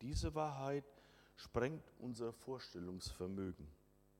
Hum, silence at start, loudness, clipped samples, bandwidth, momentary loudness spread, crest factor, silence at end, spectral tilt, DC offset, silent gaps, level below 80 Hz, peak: none; 0 s; -45 LUFS; under 0.1%; 16.5 kHz; 16 LU; 22 dB; 0.45 s; -6 dB/octave; under 0.1%; none; -56 dBFS; -24 dBFS